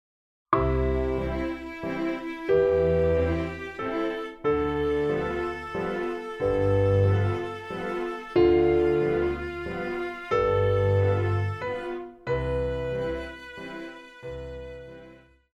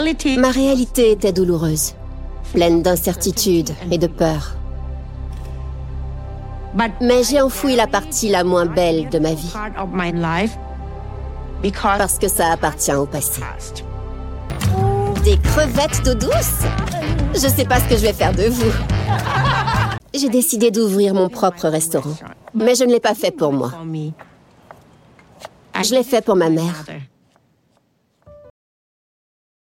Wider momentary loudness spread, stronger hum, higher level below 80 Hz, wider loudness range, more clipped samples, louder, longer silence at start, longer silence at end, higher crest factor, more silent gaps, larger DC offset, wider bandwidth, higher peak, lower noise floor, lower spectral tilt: about the same, 16 LU vs 16 LU; neither; second, -40 dBFS vs -28 dBFS; about the same, 7 LU vs 5 LU; neither; second, -26 LUFS vs -17 LUFS; first, 0.5 s vs 0 s; second, 0.4 s vs 1.3 s; about the same, 18 dB vs 18 dB; neither; neither; second, 8 kHz vs 17 kHz; second, -8 dBFS vs 0 dBFS; second, -52 dBFS vs -62 dBFS; first, -8.5 dB/octave vs -4.5 dB/octave